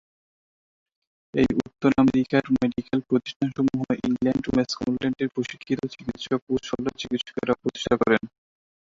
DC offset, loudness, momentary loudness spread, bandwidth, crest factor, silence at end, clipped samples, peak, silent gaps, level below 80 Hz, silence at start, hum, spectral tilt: under 0.1%; -25 LUFS; 8 LU; 7.6 kHz; 20 dB; 0.7 s; under 0.1%; -6 dBFS; 3.36-3.40 s, 6.42-6.47 s; -52 dBFS; 1.35 s; none; -6 dB/octave